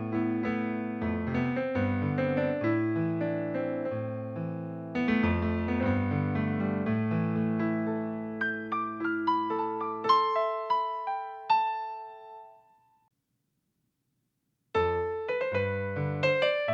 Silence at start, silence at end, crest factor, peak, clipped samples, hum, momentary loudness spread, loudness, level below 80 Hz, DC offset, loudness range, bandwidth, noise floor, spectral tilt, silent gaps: 0 s; 0 s; 18 dB; -12 dBFS; under 0.1%; none; 8 LU; -30 LUFS; -56 dBFS; under 0.1%; 6 LU; 7 kHz; -79 dBFS; -8.5 dB/octave; none